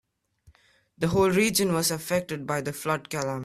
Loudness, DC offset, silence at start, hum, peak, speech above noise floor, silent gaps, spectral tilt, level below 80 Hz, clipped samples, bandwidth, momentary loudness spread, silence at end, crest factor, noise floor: -26 LUFS; under 0.1%; 1 s; none; -10 dBFS; 35 dB; none; -4 dB/octave; -56 dBFS; under 0.1%; 15.5 kHz; 9 LU; 0 s; 18 dB; -61 dBFS